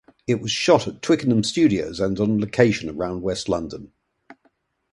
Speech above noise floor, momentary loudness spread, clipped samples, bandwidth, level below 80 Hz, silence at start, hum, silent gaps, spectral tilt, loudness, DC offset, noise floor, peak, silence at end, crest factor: 45 dB; 8 LU; under 0.1%; 11.5 kHz; -50 dBFS; 0.3 s; none; none; -5.5 dB/octave; -21 LUFS; under 0.1%; -65 dBFS; 0 dBFS; 0.6 s; 22 dB